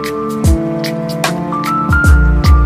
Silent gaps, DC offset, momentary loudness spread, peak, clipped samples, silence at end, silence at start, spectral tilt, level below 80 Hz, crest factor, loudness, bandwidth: none; under 0.1%; 8 LU; 0 dBFS; under 0.1%; 0 s; 0 s; -6 dB/octave; -14 dBFS; 10 dB; -13 LUFS; 15.5 kHz